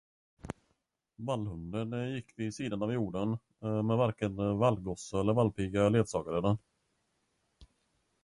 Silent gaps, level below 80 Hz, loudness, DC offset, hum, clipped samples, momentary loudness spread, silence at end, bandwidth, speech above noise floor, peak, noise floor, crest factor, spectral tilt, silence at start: none; -56 dBFS; -33 LUFS; under 0.1%; none; under 0.1%; 10 LU; 0.6 s; 11 kHz; 48 dB; -14 dBFS; -80 dBFS; 20 dB; -7 dB/octave; 0.45 s